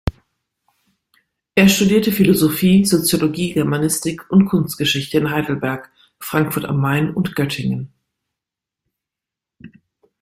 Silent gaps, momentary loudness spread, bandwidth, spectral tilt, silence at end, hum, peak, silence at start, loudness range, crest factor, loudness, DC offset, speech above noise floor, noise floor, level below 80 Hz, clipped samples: none; 10 LU; 16.5 kHz; -5 dB/octave; 0.55 s; none; -2 dBFS; 0.05 s; 8 LU; 18 dB; -17 LUFS; under 0.1%; 69 dB; -86 dBFS; -44 dBFS; under 0.1%